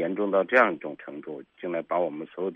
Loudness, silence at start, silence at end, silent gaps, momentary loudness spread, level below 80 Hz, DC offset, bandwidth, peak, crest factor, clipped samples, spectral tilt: -26 LUFS; 0 s; 0 s; none; 18 LU; -76 dBFS; under 0.1%; 6.6 kHz; -6 dBFS; 22 dB; under 0.1%; -3.5 dB/octave